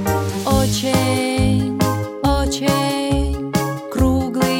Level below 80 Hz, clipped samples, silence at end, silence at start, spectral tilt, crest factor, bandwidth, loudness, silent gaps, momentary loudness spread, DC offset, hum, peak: -28 dBFS; under 0.1%; 0 s; 0 s; -5.5 dB/octave; 14 dB; 17 kHz; -18 LUFS; none; 4 LU; under 0.1%; none; -4 dBFS